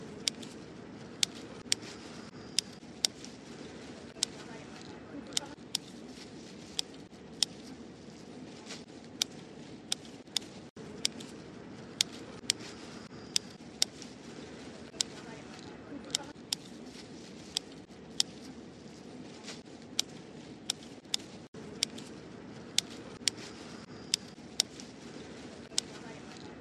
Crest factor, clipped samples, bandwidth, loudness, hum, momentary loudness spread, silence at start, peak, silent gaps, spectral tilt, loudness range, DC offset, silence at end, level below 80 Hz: 36 dB; under 0.1%; 13 kHz; -37 LUFS; none; 15 LU; 0 s; -4 dBFS; 10.70-10.76 s, 21.48-21.53 s; -1.5 dB/octave; 4 LU; under 0.1%; 0 s; -68 dBFS